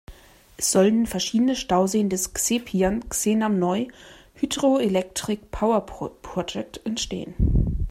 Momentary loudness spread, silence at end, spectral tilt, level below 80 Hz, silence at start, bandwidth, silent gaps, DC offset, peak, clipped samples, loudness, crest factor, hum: 10 LU; 0 s; -4.5 dB/octave; -34 dBFS; 0.1 s; 16 kHz; none; under 0.1%; -6 dBFS; under 0.1%; -23 LUFS; 18 dB; none